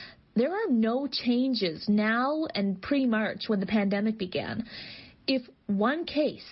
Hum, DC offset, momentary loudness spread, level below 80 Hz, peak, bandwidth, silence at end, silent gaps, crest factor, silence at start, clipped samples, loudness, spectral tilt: none; under 0.1%; 7 LU; -62 dBFS; -14 dBFS; 5.8 kHz; 0 s; none; 14 dB; 0 s; under 0.1%; -28 LUFS; -9 dB/octave